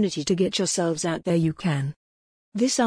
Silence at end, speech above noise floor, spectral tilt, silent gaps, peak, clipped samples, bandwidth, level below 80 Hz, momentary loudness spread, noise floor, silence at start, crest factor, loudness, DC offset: 0 s; over 67 dB; -4.5 dB/octave; 1.96-2.52 s; -10 dBFS; under 0.1%; 10.5 kHz; -58 dBFS; 6 LU; under -90 dBFS; 0 s; 14 dB; -25 LUFS; under 0.1%